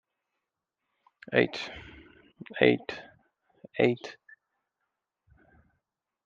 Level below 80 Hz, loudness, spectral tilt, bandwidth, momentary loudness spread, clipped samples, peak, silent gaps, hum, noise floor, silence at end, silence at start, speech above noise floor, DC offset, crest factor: -66 dBFS; -28 LUFS; -6.5 dB/octave; 7.6 kHz; 21 LU; under 0.1%; -8 dBFS; none; none; -86 dBFS; 2.15 s; 1.3 s; 59 dB; under 0.1%; 26 dB